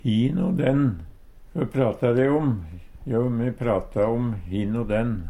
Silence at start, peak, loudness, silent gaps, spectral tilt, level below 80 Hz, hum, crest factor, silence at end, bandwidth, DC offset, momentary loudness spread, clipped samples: 0.05 s; -8 dBFS; -24 LUFS; none; -9 dB/octave; -42 dBFS; none; 16 dB; 0 s; 11 kHz; under 0.1%; 9 LU; under 0.1%